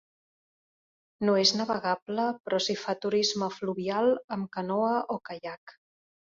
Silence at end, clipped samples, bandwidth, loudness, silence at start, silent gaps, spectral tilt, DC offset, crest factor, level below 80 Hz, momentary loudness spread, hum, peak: 0.6 s; under 0.1%; 7.8 kHz; -28 LUFS; 1.2 s; 2.02-2.06 s, 2.40-2.44 s, 4.24-4.28 s, 5.57-5.67 s; -4 dB/octave; under 0.1%; 22 dB; -72 dBFS; 12 LU; none; -8 dBFS